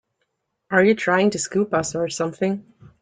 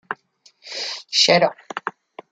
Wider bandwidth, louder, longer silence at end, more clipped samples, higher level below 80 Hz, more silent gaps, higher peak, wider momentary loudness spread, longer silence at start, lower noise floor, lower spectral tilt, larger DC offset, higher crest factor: about the same, 9.6 kHz vs 9.4 kHz; about the same, -21 LUFS vs -19 LUFS; about the same, 0.4 s vs 0.4 s; neither; first, -60 dBFS vs -70 dBFS; neither; second, -4 dBFS vs 0 dBFS; second, 8 LU vs 18 LU; first, 0.7 s vs 0.1 s; first, -74 dBFS vs -57 dBFS; first, -4.5 dB/octave vs -2.5 dB/octave; neither; about the same, 18 dB vs 22 dB